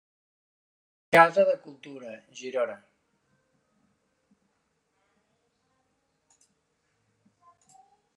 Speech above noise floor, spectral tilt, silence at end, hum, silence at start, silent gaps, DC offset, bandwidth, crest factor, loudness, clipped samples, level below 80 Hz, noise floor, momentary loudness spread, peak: 50 dB; -4.5 dB/octave; 5.4 s; none; 1.1 s; none; under 0.1%; 11 kHz; 28 dB; -23 LUFS; under 0.1%; -80 dBFS; -75 dBFS; 25 LU; -4 dBFS